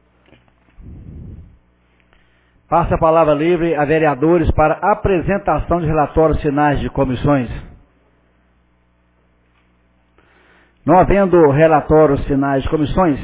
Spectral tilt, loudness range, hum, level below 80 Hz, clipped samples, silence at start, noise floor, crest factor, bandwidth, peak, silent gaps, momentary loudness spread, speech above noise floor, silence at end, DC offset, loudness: -11.5 dB/octave; 8 LU; 60 Hz at -45 dBFS; -30 dBFS; under 0.1%; 0.85 s; -57 dBFS; 16 dB; 4 kHz; 0 dBFS; none; 7 LU; 44 dB; 0 s; under 0.1%; -15 LUFS